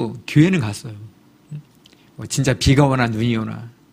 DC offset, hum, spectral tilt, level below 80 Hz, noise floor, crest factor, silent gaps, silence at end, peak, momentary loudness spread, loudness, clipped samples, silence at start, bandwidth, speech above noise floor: under 0.1%; none; -6 dB/octave; -40 dBFS; -51 dBFS; 20 dB; none; 0.25 s; 0 dBFS; 22 LU; -18 LUFS; under 0.1%; 0 s; 15.5 kHz; 33 dB